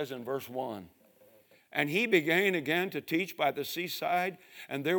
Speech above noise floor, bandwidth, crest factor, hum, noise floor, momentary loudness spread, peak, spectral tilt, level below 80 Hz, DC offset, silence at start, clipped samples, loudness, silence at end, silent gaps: 30 dB; 19.5 kHz; 20 dB; none; -62 dBFS; 12 LU; -12 dBFS; -4.5 dB/octave; -82 dBFS; under 0.1%; 0 s; under 0.1%; -31 LUFS; 0 s; none